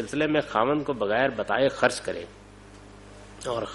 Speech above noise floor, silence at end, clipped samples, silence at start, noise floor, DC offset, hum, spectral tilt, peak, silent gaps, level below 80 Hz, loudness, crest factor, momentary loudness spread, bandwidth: 22 dB; 0 s; under 0.1%; 0 s; -47 dBFS; under 0.1%; 50 Hz at -55 dBFS; -4.5 dB/octave; -6 dBFS; none; -54 dBFS; -25 LUFS; 20 dB; 14 LU; 11.5 kHz